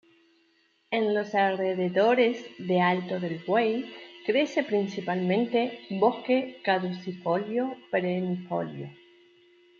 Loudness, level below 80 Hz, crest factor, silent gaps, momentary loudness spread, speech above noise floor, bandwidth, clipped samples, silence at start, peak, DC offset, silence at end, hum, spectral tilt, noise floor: -27 LUFS; -78 dBFS; 18 dB; none; 9 LU; 40 dB; 7.2 kHz; under 0.1%; 0.9 s; -8 dBFS; under 0.1%; 0.85 s; none; -7 dB/octave; -67 dBFS